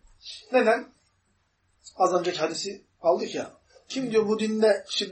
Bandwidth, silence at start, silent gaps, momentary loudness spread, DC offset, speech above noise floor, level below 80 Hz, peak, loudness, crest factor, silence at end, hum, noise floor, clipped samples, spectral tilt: 8.8 kHz; 0.25 s; none; 13 LU; under 0.1%; 45 dB; -68 dBFS; -8 dBFS; -26 LUFS; 18 dB; 0 s; none; -70 dBFS; under 0.1%; -4 dB/octave